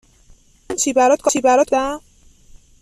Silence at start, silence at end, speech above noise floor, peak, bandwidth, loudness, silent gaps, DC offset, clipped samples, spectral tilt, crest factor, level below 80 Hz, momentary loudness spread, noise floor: 0.7 s; 0.85 s; 34 dB; -4 dBFS; 14.5 kHz; -16 LUFS; none; under 0.1%; under 0.1%; -2 dB/octave; 16 dB; -50 dBFS; 12 LU; -50 dBFS